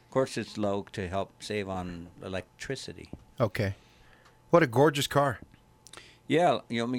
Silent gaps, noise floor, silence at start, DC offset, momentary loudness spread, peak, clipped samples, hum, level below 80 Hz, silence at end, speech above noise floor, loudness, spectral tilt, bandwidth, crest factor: none; -58 dBFS; 0.1 s; under 0.1%; 22 LU; -8 dBFS; under 0.1%; none; -58 dBFS; 0 s; 29 dB; -29 LUFS; -5.5 dB/octave; 16 kHz; 22 dB